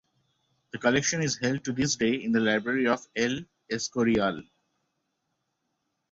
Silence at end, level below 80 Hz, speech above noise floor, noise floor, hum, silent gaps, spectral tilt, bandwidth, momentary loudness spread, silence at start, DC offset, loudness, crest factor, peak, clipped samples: 1.7 s; -60 dBFS; 53 dB; -79 dBFS; none; none; -4 dB/octave; 8 kHz; 8 LU; 0.75 s; under 0.1%; -27 LUFS; 20 dB; -8 dBFS; under 0.1%